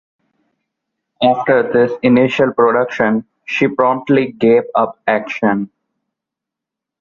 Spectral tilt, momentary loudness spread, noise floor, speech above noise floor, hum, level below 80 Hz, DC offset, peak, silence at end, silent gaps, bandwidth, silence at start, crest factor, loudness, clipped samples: -7 dB/octave; 5 LU; -83 dBFS; 70 dB; none; -56 dBFS; under 0.1%; -2 dBFS; 1.35 s; none; 7.2 kHz; 1.2 s; 14 dB; -15 LUFS; under 0.1%